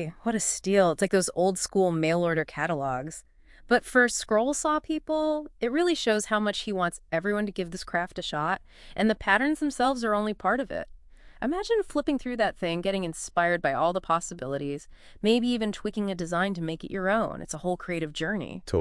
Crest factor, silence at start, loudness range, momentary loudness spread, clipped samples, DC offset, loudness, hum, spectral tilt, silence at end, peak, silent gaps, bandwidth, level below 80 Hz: 20 dB; 0 s; 3 LU; 9 LU; under 0.1%; under 0.1%; -27 LUFS; none; -4 dB/octave; 0 s; -8 dBFS; none; 12 kHz; -52 dBFS